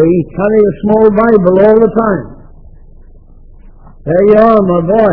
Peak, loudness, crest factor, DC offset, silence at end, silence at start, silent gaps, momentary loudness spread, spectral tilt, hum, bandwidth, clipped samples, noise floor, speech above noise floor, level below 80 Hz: 0 dBFS; -9 LUFS; 10 dB; under 0.1%; 0 s; 0 s; none; 8 LU; -11.5 dB/octave; none; 4.8 kHz; 1%; -35 dBFS; 27 dB; -34 dBFS